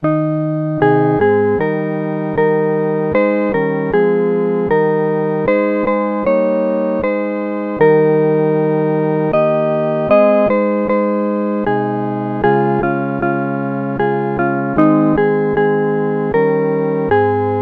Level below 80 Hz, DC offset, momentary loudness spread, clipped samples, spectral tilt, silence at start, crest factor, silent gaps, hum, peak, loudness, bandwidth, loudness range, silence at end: -46 dBFS; under 0.1%; 5 LU; under 0.1%; -10.5 dB/octave; 0 s; 14 dB; none; none; 0 dBFS; -15 LUFS; 4.9 kHz; 2 LU; 0 s